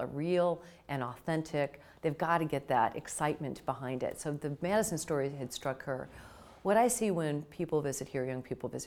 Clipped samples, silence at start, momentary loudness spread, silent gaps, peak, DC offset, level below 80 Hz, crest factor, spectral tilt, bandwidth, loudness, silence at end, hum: under 0.1%; 0 s; 9 LU; none; -14 dBFS; under 0.1%; -64 dBFS; 20 dB; -5 dB/octave; 19 kHz; -34 LUFS; 0 s; none